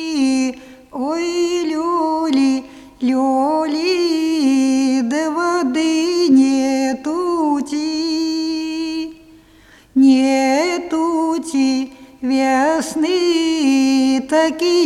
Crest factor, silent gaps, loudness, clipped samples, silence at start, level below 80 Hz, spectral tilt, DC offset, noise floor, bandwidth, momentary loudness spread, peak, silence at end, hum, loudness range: 14 dB; none; -17 LUFS; under 0.1%; 0 s; -56 dBFS; -3 dB/octave; under 0.1%; -47 dBFS; 12.5 kHz; 9 LU; -2 dBFS; 0 s; none; 3 LU